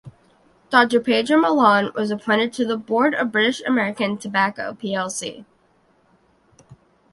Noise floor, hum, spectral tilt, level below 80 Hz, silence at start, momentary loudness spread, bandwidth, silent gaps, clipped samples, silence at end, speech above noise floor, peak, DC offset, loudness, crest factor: -60 dBFS; none; -4 dB/octave; -64 dBFS; 0.05 s; 10 LU; 11.5 kHz; none; under 0.1%; 0.4 s; 40 dB; 0 dBFS; under 0.1%; -20 LUFS; 20 dB